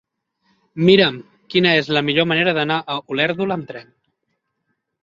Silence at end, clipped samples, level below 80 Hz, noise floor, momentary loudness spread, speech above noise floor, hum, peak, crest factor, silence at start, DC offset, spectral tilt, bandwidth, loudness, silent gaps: 1.2 s; under 0.1%; -60 dBFS; -73 dBFS; 19 LU; 56 dB; none; 0 dBFS; 20 dB; 0.75 s; under 0.1%; -6.5 dB/octave; 7.4 kHz; -17 LUFS; none